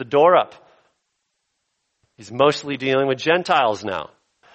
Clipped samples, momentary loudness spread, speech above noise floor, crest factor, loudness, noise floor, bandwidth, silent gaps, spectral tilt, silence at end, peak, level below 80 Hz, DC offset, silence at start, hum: under 0.1%; 15 LU; 56 dB; 20 dB; -19 LUFS; -74 dBFS; 8.4 kHz; none; -5 dB/octave; 0.5 s; -2 dBFS; -66 dBFS; under 0.1%; 0 s; none